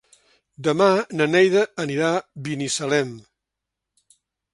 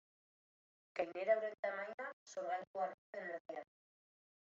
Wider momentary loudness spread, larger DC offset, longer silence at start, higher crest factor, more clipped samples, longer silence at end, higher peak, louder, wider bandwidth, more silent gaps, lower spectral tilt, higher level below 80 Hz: about the same, 10 LU vs 12 LU; neither; second, 0.6 s vs 0.95 s; about the same, 20 dB vs 22 dB; neither; first, 1.35 s vs 0.8 s; first, -4 dBFS vs -22 dBFS; first, -21 LUFS vs -43 LUFS; first, 11.5 kHz vs 7.6 kHz; second, none vs 1.59-1.63 s, 1.94-1.98 s, 2.13-2.26 s, 2.67-2.74 s, 2.94-3.13 s, 3.40-3.45 s; first, -4.5 dB/octave vs -2 dB/octave; first, -66 dBFS vs under -90 dBFS